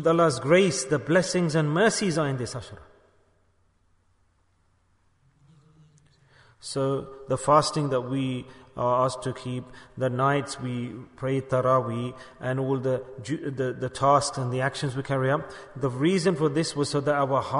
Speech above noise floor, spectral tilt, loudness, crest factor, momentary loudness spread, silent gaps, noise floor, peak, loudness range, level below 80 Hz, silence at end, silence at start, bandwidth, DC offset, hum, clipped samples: 41 dB; -5.5 dB/octave; -26 LUFS; 20 dB; 13 LU; none; -66 dBFS; -8 dBFS; 8 LU; -58 dBFS; 0 s; 0 s; 11 kHz; under 0.1%; none; under 0.1%